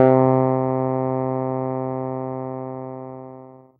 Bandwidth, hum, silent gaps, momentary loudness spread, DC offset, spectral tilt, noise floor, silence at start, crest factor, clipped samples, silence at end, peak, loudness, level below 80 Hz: 3.3 kHz; none; none; 19 LU; under 0.1%; -13 dB/octave; -42 dBFS; 0 s; 20 dB; under 0.1%; 0.25 s; -2 dBFS; -22 LUFS; -64 dBFS